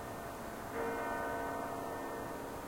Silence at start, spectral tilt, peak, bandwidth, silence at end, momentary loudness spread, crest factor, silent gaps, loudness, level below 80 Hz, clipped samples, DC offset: 0 s; -5 dB/octave; -26 dBFS; 16.5 kHz; 0 s; 6 LU; 14 dB; none; -41 LUFS; -60 dBFS; under 0.1%; under 0.1%